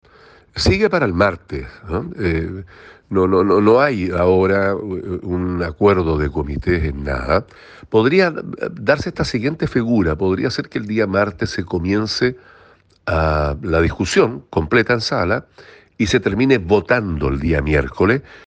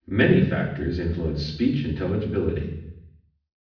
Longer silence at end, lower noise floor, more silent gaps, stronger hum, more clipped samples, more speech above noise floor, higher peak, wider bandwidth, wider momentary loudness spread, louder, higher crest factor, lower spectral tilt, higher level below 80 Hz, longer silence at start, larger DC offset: second, 0.1 s vs 0.55 s; about the same, -51 dBFS vs -53 dBFS; neither; neither; neither; about the same, 33 dB vs 30 dB; first, -2 dBFS vs -6 dBFS; first, 9.4 kHz vs 5.4 kHz; second, 9 LU vs 13 LU; first, -18 LUFS vs -24 LUFS; about the same, 16 dB vs 18 dB; second, -6.5 dB/octave vs -8.5 dB/octave; about the same, -34 dBFS vs -38 dBFS; first, 0.55 s vs 0.1 s; neither